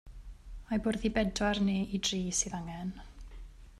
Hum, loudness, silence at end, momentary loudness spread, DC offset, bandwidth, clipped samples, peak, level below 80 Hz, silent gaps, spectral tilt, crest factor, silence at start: none; -32 LUFS; 0 s; 22 LU; under 0.1%; 13 kHz; under 0.1%; -16 dBFS; -48 dBFS; none; -4 dB/octave; 18 dB; 0.05 s